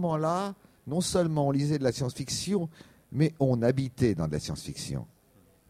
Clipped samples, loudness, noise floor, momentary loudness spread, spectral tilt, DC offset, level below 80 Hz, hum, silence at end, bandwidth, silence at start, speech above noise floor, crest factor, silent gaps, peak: under 0.1%; -29 LUFS; -62 dBFS; 11 LU; -6 dB/octave; under 0.1%; -54 dBFS; none; 0.65 s; 15.5 kHz; 0 s; 33 dB; 18 dB; none; -12 dBFS